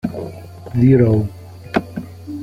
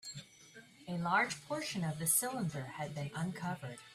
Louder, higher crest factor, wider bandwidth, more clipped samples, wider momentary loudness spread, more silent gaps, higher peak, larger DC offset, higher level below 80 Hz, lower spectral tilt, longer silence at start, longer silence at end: first, -17 LUFS vs -36 LUFS; second, 16 dB vs 22 dB; second, 12.5 kHz vs 15.5 kHz; neither; about the same, 20 LU vs 21 LU; neither; first, -2 dBFS vs -16 dBFS; neither; first, -44 dBFS vs -72 dBFS; first, -9.5 dB/octave vs -3.5 dB/octave; about the same, 0.05 s vs 0.05 s; about the same, 0 s vs 0 s